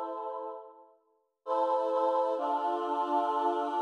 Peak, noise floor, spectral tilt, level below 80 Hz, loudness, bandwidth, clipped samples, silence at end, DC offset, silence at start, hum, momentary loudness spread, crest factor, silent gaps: -18 dBFS; -72 dBFS; -3 dB/octave; under -90 dBFS; -31 LUFS; 10 kHz; under 0.1%; 0 s; under 0.1%; 0 s; none; 12 LU; 12 dB; none